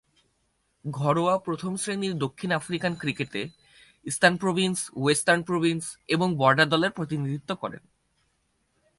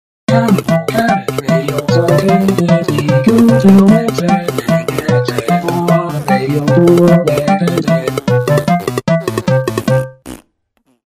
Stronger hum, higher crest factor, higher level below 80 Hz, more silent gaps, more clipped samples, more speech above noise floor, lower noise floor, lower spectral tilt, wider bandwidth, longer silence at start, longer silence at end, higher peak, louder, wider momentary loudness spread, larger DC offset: neither; first, 22 dB vs 12 dB; second, -64 dBFS vs -44 dBFS; neither; neither; second, 46 dB vs 50 dB; first, -72 dBFS vs -59 dBFS; second, -4.5 dB/octave vs -7 dB/octave; second, 11.5 kHz vs 16 kHz; first, 0.85 s vs 0.3 s; first, 1.2 s vs 0.75 s; second, -4 dBFS vs 0 dBFS; second, -25 LUFS vs -12 LUFS; first, 12 LU vs 7 LU; neither